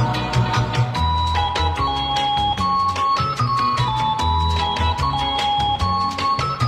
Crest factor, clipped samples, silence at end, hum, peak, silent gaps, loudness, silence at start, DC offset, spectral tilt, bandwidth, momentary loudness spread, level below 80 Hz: 12 dB; under 0.1%; 0 s; none; -8 dBFS; none; -19 LUFS; 0 s; under 0.1%; -5 dB/octave; 13 kHz; 2 LU; -32 dBFS